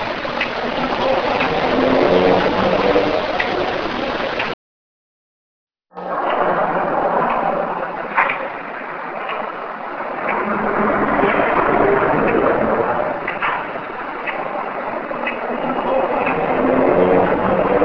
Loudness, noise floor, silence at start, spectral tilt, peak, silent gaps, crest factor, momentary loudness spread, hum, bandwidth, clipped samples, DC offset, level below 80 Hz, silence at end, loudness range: -18 LUFS; under -90 dBFS; 0 s; -6.5 dB/octave; 0 dBFS; 4.54-5.67 s; 18 dB; 10 LU; none; 5.4 kHz; under 0.1%; under 0.1%; -44 dBFS; 0 s; 6 LU